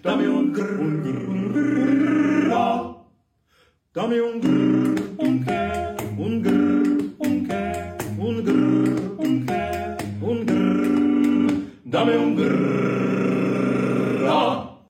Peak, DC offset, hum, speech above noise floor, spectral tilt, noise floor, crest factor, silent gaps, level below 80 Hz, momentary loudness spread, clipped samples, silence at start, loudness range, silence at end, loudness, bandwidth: -8 dBFS; under 0.1%; none; 41 dB; -7 dB/octave; -63 dBFS; 14 dB; none; -54 dBFS; 8 LU; under 0.1%; 0.05 s; 3 LU; 0.15 s; -22 LUFS; 16 kHz